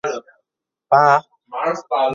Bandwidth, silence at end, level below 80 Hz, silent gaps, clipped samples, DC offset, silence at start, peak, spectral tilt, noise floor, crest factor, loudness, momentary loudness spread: 7.4 kHz; 0 s; -68 dBFS; none; under 0.1%; under 0.1%; 0.05 s; 0 dBFS; -5 dB/octave; -81 dBFS; 18 dB; -17 LUFS; 17 LU